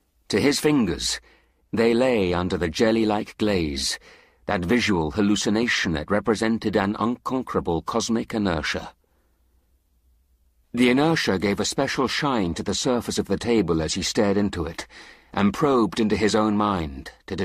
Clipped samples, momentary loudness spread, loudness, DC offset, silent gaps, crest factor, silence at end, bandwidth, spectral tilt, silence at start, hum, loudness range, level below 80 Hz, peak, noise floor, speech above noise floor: under 0.1%; 8 LU; -23 LUFS; under 0.1%; none; 16 dB; 0 s; 15 kHz; -4.5 dB/octave; 0.3 s; none; 3 LU; -46 dBFS; -6 dBFS; -64 dBFS; 42 dB